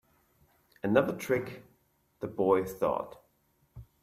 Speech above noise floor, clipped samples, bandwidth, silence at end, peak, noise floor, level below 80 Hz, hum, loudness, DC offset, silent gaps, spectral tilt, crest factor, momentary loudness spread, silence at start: 42 dB; under 0.1%; 16 kHz; 0.2 s; -12 dBFS; -71 dBFS; -64 dBFS; none; -30 LUFS; under 0.1%; none; -6.5 dB/octave; 22 dB; 16 LU; 0.85 s